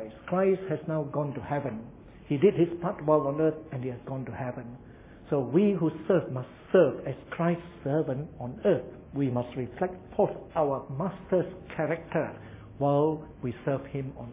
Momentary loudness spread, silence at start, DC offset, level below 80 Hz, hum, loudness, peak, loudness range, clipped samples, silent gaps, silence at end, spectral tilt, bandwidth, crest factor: 12 LU; 0 s; under 0.1%; -56 dBFS; none; -29 LUFS; -10 dBFS; 3 LU; under 0.1%; none; 0 s; -12 dB/octave; 3.8 kHz; 20 dB